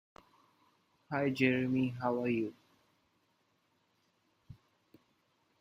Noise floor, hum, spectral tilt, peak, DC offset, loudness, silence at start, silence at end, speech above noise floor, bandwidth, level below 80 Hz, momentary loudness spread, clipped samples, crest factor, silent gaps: -76 dBFS; none; -7.5 dB/octave; -14 dBFS; under 0.1%; -33 LUFS; 1.1 s; 1.05 s; 44 dB; 10 kHz; -74 dBFS; 8 LU; under 0.1%; 24 dB; none